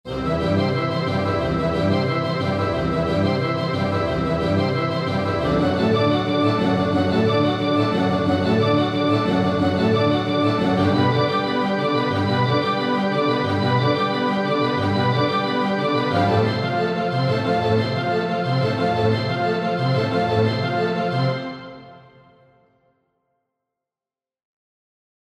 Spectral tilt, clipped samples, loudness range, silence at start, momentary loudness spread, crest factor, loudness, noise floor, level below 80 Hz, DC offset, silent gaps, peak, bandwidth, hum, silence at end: -7.5 dB/octave; under 0.1%; 3 LU; 0.05 s; 3 LU; 16 dB; -20 LUFS; under -90 dBFS; -46 dBFS; under 0.1%; none; -6 dBFS; 12 kHz; none; 3.4 s